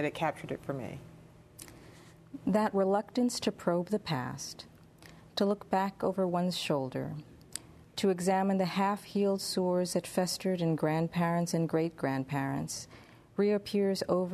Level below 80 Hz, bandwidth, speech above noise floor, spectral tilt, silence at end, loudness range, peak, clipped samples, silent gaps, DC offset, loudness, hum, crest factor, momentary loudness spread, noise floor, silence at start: -66 dBFS; 13.5 kHz; 24 dB; -5.5 dB/octave; 0 s; 3 LU; -14 dBFS; under 0.1%; none; under 0.1%; -32 LUFS; none; 18 dB; 15 LU; -55 dBFS; 0 s